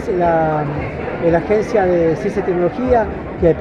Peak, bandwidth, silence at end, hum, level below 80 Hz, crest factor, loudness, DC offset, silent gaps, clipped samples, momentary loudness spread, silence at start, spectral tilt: -2 dBFS; 9.6 kHz; 0 s; none; -34 dBFS; 14 dB; -17 LUFS; under 0.1%; none; under 0.1%; 7 LU; 0 s; -8 dB/octave